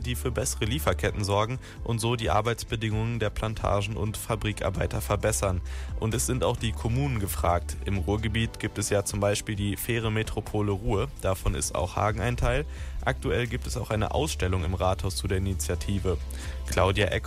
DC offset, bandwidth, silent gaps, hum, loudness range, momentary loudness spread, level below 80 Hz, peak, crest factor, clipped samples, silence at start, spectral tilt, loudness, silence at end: under 0.1%; 16 kHz; none; none; 1 LU; 5 LU; -36 dBFS; -10 dBFS; 18 dB; under 0.1%; 0 s; -5 dB/octave; -28 LUFS; 0 s